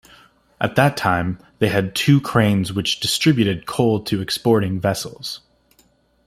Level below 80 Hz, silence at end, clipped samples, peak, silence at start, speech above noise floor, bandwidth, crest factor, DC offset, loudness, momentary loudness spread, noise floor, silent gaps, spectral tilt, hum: -52 dBFS; 0.9 s; under 0.1%; -2 dBFS; 0.6 s; 40 dB; 16 kHz; 18 dB; under 0.1%; -19 LUFS; 10 LU; -59 dBFS; none; -5.5 dB/octave; none